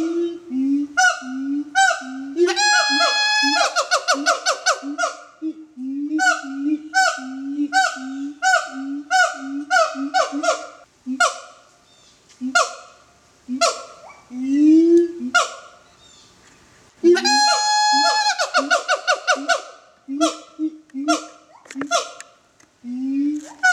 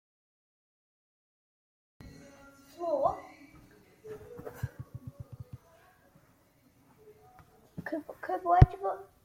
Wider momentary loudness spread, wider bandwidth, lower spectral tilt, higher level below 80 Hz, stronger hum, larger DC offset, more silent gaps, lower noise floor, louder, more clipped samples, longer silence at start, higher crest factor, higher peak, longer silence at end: second, 16 LU vs 29 LU; second, 14 kHz vs 15.5 kHz; second, 0 dB/octave vs -9 dB/octave; second, -70 dBFS vs -42 dBFS; neither; neither; neither; second, -55 dBFS vs -65 dBFS; first, -19 LUFS vs -31 LUFS; neither; second, 0 s vs 2.05 s; second, 18 dB vs 32 dB; about the same, -2 dBFS vs -2 dBFS; second, 0 s vs 0.2 s